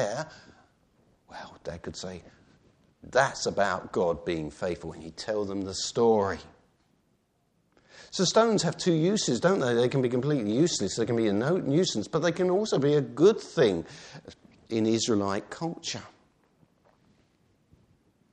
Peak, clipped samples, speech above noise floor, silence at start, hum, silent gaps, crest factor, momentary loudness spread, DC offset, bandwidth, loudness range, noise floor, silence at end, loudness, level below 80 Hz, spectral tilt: -8 dBFS; under 0.1%; 44 dB; 0 s; none; none; 20 dB; 16 LU; under 0.1%; 10 kHz; 7 LU; -71 dBFS; 2.25 s; -27 LUFS; -62 dBFS; -5 dB/octave